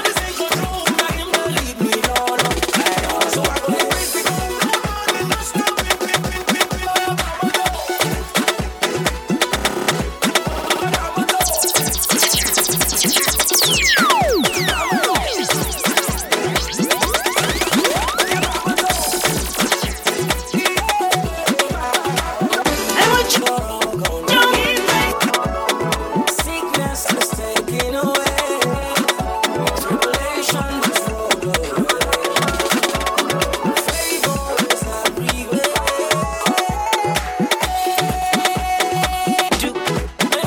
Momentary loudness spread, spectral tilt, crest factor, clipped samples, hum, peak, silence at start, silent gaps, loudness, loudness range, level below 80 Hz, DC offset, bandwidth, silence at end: 6 LU; -2.5 dB/octave; 18 dB; under 0.1%; none; 0 dBFS; 0 s; none; -17 LUFS; 4 LU; -32 dBFS; under 0.1%; 19 kHz; 0 s